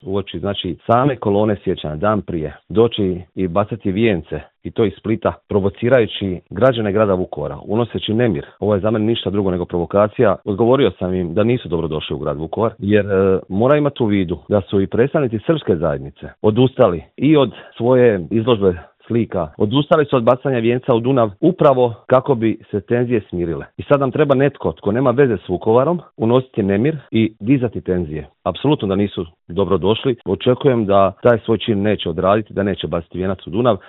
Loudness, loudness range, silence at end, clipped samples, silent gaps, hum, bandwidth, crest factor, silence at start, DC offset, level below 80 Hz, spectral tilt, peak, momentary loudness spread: -17 LUFS; 3 LU; 0.1 s; under 0.1%; none; none; 4.1 kHz; 16 dB; 0.05 s; under 0.1%; -48 dBFS; -10.5 dB/octave; 0 dBFS; 8 LU